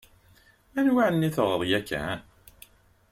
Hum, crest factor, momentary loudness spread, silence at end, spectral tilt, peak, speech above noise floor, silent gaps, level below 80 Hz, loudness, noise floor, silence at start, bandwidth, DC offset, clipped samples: none; 18 dB; 12 LU; 0.9 s; -6 dB/octave; -10 dBFS; 34 dB; none; -56 dBFS; -26 LUFS; -59 dBFS; 0.75 s; 16.5 kHz; under 0.1%; under 0.1%